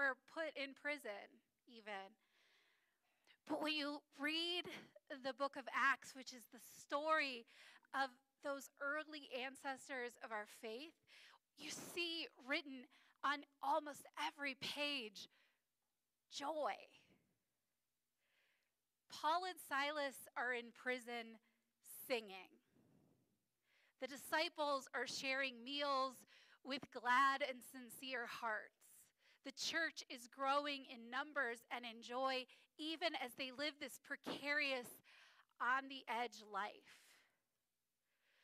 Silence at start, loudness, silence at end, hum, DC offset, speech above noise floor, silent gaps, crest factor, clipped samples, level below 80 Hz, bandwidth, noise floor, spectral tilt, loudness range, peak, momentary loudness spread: 0 s; -44 LUFS; 1.45 s; none; under 0.1%; over 44 dB; none; 20 dB; under 0.1%; under -90 dBFS; 15.5 kHz; under -90 dBFS; -1.5 dB/octave; 7 LU; -28 dBFS; 16 LU